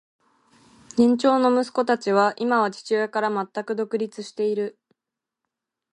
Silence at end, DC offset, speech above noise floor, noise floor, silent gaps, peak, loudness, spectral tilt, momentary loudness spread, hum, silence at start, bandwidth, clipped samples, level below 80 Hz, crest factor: 1.2 s; under 0.1%; 65 dB; -87 dBFS; none; -6 dBFS; -23 LUFS; -5.5 dB/octave; 10 LU; none; 0.95 s; 11 kHz; under 0.1%; -72 dBFS; 18 dB